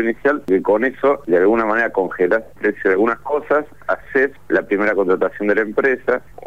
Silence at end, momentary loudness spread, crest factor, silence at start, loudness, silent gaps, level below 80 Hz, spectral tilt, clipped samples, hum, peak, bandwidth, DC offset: 0.25 s; 4 LU; 12 dB; 0 s; -18 LUFS; none; -52 dBFS; -7.5 dB/octave; under 0.1%; 50 Hz at -55 dBFS; -6 dBFS; 7.4 kHz; 0.9%